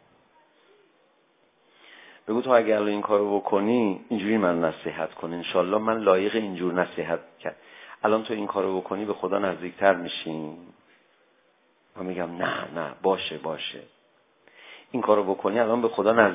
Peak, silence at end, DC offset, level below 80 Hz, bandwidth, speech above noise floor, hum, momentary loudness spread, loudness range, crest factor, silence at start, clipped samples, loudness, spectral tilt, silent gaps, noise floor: -2 dBFS; 0 s; under 0.1%; -66 dBFS; 3.9 kHz; 40 dB; none; 14 LU; 7 LU; 26 dB; 2.25 s; under 0.1%; -25 LUFS; -9.5 dB/octave; none; -65 dBFS